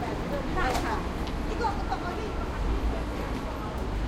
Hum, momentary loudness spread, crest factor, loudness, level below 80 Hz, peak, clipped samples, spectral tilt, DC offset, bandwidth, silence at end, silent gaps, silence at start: none; 5 LU; 16 dB; -31 LUFS; -34 dBFS; -14 dBFS; under 0.1%; -6 dB/octave; under 0.1%; 15.5 kHz; 0 s; none; 0 s